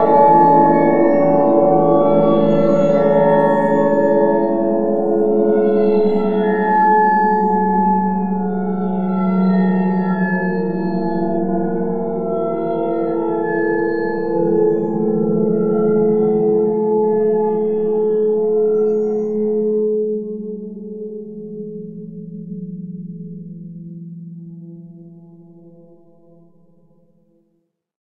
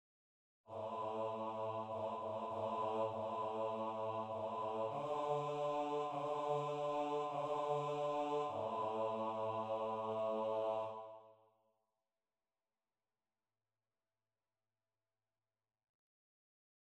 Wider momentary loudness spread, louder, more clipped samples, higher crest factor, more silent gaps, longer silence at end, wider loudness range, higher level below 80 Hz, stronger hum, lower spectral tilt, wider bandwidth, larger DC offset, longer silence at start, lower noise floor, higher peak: first, 18 LU vs 4 LU; first, -16 LUFS vs -41 LUFS; neither; about the same, 16 dB vs 14 dB; neither; second, 0.1 s vs 5.55 s; first, 18 LU vs 4 LU; first, -52 dBFS vs -86 dBFS; neither; first, -10 dB/octave vs -6.5 dB/octave; second, 4.6 kHz vs 9.6 kHz; first, 2% vs under 0.1%; second, 0 s vs 0.7 s; second, -67 dBFS vs under -90 dBFS; first, 0 dBFS vs -28 dBFS